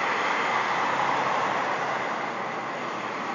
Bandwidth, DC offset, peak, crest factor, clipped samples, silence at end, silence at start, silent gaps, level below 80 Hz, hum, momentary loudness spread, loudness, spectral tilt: 7.6 kHz; under 0.1%; -12 dBFS; 14 dB; under 0.1%; 0 s; 0 s; none; -74 dBFS; none; 6 LU; -26 LUFS; -3.5 dB/octave